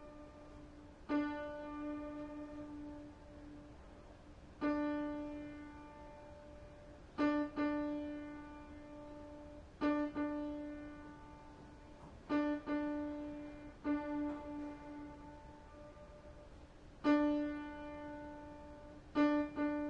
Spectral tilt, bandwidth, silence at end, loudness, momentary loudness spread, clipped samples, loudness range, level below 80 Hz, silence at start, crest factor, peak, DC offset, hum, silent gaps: -7 dB/octave; 7.2 kHz; 0 s; -41 LUFS; 20 LU; under 0.1%; 5 LU; -62 dBFS; 0 s; 20 dB; -22 dBFS; under 0.1%; none; none